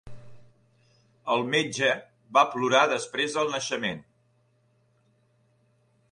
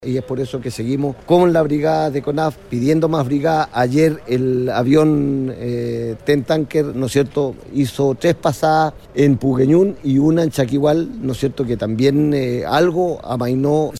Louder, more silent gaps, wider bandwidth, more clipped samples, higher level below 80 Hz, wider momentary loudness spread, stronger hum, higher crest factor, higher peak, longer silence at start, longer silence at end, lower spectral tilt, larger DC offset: second, -25 LUFS vs -17 LUFS; neither; second, 11 kHz vs 14.5 kHz; neither; second, -66 dBFS vs -46 dBFS; first, 11 LU vs 8 LU; neither; first, 22 dB vs 14 dB; second, -6 dBFS vs -2 dBFS; about the same, 0.05 s vs 0 s; first, 2.1 s vs 0 s; second, -3 dB/octave vs -7 dB/octave; neither